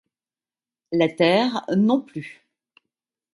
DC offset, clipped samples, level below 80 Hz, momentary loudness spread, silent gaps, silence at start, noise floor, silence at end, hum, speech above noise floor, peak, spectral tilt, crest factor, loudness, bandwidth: under 0.1%; under 0.1%; -70 dBFS; 17 LU; none; 0.9 s; under -90 dBFS; 1 s; none; over 69 dB; -4 dBFS; -6.5 dB/octave; 20 dB; -21 LUFS; 11 kHz